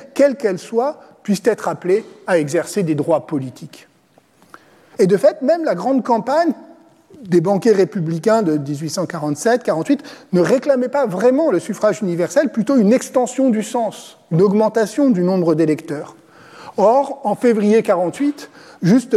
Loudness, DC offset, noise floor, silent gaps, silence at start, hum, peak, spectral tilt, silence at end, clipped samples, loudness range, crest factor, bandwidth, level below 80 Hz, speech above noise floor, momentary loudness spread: -17 LUFS; under 0.1%; -54 dBFS; none; 0 s; none; -2 dBFS; -6.5 dB/octave; 0 s; under 0.1%; 3 LU; 14 dB; 14.5 kHz; -70 dBFS; 38 dB; 8 LU